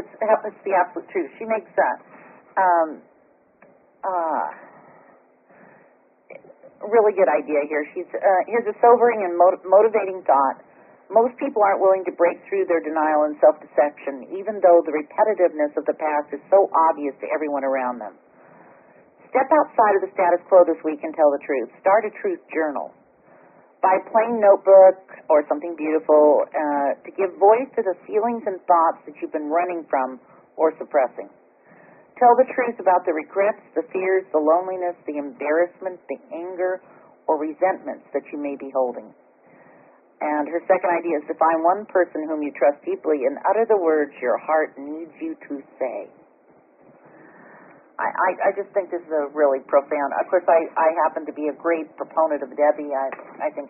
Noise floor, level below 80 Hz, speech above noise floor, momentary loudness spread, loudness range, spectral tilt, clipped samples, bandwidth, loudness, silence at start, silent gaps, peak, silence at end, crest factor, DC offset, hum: -58 dBFS; -76 dBFS; 38 dB; 13 LU; 8 LU; 2 dB/octave; under 0.1%; 3 kHz; -21 LUFS; 0 s; none; -2 dBFS; 0 s; 20 dB; under 0.1%; none